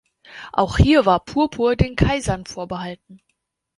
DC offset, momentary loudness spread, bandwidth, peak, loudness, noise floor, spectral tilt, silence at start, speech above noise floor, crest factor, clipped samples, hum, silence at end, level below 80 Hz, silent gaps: under 0.1%; 16 LU; 11.5 kHz; -2 dBFS; -19 LUFS; -41 dBFS; -6.5 dB/octave; 0.3 s; 22 dB; 18 dB; under 0.1%; none; 0.65 s; -32 dBFS; none